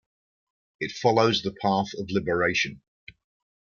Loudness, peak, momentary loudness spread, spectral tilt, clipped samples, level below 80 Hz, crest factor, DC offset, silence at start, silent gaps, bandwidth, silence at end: -25 LUFS; -6 dBFS; 9 LU; -5 dB/octave; under 0.1%; -60 dBFS; 22 dB; under 0.1%; 0.8 s; none; 7.2 kHz; 0.95 s